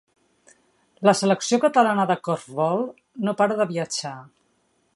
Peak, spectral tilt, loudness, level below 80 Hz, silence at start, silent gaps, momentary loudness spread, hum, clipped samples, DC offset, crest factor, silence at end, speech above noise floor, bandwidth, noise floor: -2 dBFS; -4.5 dB/octave; -22 LUFS; -74 dBFS; 1 s; none; 11 LU; none; under 0.1%; under 0.1%; 20 dB; 0.75 s; 46 dB; 11.5 kHz; -67 dBFS